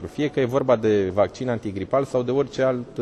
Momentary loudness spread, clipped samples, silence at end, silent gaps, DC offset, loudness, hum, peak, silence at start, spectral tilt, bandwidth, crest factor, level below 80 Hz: 6 LU; under 0.1%; 0 s; none; under 0.1%; -23 LUFS; none; -6 dBFS; 0 s; -7 dB/octave; 12.5 kHz; 16 dB; -54 dBFS